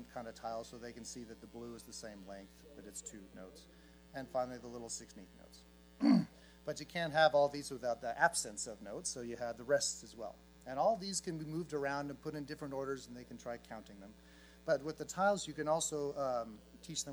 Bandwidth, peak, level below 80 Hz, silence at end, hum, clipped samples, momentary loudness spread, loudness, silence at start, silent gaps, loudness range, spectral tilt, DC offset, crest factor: 19.5 kHz; -16 dBFS; -66 dBFS; 0 s; none; under 0.1%; 20 LU; -38 LUFS; 0 s; none; 13 LU; -4 dB/octave; under 0.1%; 24 dB